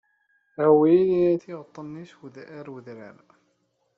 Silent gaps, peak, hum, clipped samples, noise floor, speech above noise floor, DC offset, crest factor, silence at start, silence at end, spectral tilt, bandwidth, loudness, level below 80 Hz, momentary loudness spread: none; -6 dBFS; none; under 0.1%; -71 dBFS; 48 dB; under 0.1%; 18 dB; 0.6 s; 0.9 s; -8 dB/octave; 6 kHz; -20 LUFS; -68 dBFS; 26 LU